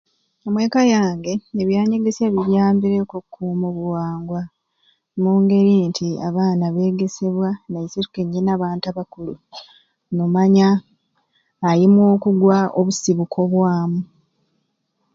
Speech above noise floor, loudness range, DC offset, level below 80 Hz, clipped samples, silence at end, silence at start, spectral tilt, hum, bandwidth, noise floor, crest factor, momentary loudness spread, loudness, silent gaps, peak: 53 dB; 5 LU; under 0.1%; -58 dBFS; under 0.1%; 1.1 s; 0.45 s; -7 dB/octave; none; 7.6 kHz; -70 dBFS; 16 dB; 14 LU; -18 LUFS; none; -4 dBFS